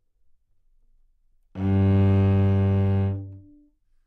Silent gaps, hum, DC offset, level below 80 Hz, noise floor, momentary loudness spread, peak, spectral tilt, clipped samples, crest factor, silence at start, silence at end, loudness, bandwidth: none; none; under 0.1%; -52 dBFS; -62 dBFS; 15 LU; -12 dBFS; -11 dB/octave; under 0.1%; 12 dB; 1.55 s; 0.7 s; -22 LUFS; 4 kHz